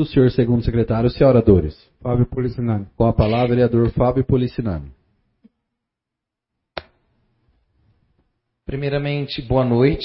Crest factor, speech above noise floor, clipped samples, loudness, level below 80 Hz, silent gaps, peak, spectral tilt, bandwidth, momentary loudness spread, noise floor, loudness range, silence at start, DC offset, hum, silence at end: 18 dB; 67 dB; under 0.1%; -18 LUFS; -34 dBFS; none; -2 dBFS; -13 dB/octave; 5.8 kHz; 16 LU; -84 dBFS; 14 LU; 0 s; under 0.1%; none; 0 s